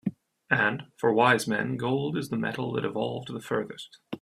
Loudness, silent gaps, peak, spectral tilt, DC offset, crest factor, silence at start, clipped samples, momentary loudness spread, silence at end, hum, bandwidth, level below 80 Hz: -27 LUFS; none; -6 dBFS; -5.5 dB/octave; under 0.1%; 22 dB; 0.05 s; under 0.1%; 14 LU; 0.05 s; none; 15.5 kHz; -68 dBFS